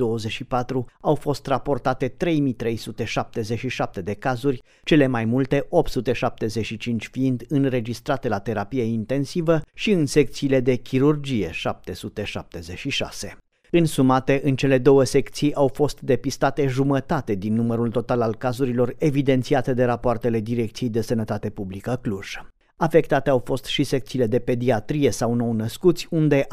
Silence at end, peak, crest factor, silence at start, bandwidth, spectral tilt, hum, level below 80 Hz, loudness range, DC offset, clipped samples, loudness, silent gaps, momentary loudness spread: 0 s; -4 dBFS; 18 dB; 0 s; 15.5 kHz; -6.5 dB/octave; none; -44 dBFS; 4 LU; under 0.1%; under 0.1%; -23 LUFS; none; 9 LU